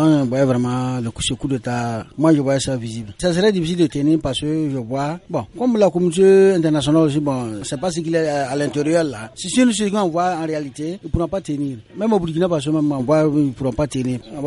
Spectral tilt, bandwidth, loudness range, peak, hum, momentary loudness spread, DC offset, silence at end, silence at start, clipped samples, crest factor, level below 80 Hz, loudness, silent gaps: -6 dB/octave; 11.5 kHz; 4 LU; -2 dBFS; none; 9 LU; under 0.1%; 0 s; 0 s; under 0.1%; 16 dB; -42 dBFS; -19 LUFS; none